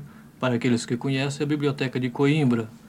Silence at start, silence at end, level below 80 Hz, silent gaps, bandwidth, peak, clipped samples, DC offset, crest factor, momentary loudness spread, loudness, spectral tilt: 0 s; 0 s; -64 dBFS; none; 12.5 kHz; -10 dBFS; under 0.1%; under 0.1%; 14 dB; 5 LU; -24 LUFS; -6.5 dB/octave